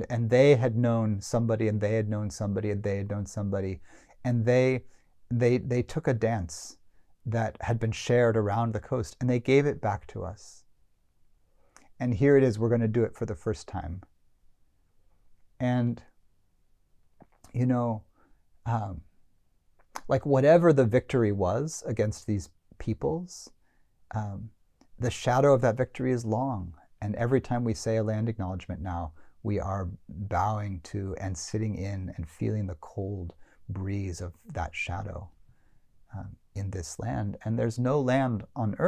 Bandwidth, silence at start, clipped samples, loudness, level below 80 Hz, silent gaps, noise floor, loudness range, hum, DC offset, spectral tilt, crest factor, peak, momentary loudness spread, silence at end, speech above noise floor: 12 kHz; 0 s; under 0.1%; -28 LUFS; -48 dBFS; none; -65 dBFS; 9 LU; none; under 0.1%; -7 dB/octave; 20 dB; -8 dBFS; 16 LU; 0 s; 38 dB